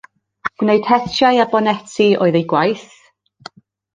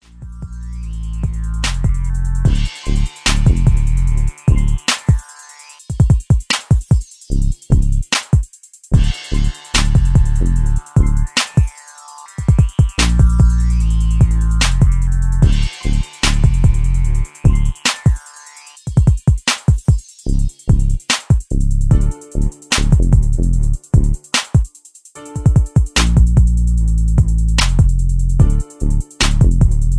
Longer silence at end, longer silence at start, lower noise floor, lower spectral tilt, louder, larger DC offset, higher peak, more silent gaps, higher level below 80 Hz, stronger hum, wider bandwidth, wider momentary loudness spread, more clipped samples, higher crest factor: first, 1.1 s vs 0 s; first, 0.45 s vs 0.2 s; about the same, -41 dBFS vs -43 dBFS; about the same, -5.5 dB/octave vs -5 dB/octave; about the same, -16 LUFS vs -16 LUFS; neither; about the same, 0 dBFS vs 0 dBFS; neither; second, -58 dBFS vs -16 dBFS; neither; second, 9.6 kHz vs 11 kHz; about the same, 10 LU vs 9 LU; neither; about the same, 16 dB vs 14 dB